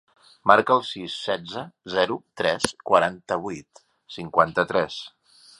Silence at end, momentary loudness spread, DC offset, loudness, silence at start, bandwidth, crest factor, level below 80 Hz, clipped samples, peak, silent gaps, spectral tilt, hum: 0.5 s; 17 LU; under 0.1%; -23 LUFS; 0.45 s; 11.5 kHz; 24 dB; -60 dBFS; under 0.1%; 0 dBFS; none; -4 dB/octave; none